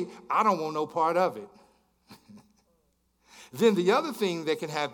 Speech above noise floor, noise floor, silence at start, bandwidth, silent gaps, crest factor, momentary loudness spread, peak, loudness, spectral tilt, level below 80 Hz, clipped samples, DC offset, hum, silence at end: 44 dB; -71 dBFS; 0 s; 18 kHz; none; 18 dB; 7 LU; -10 dBFS; -27 LUFS; -5 dB/octave; -76 dBFS; under 0.1%; under 0.1%; none; 0 s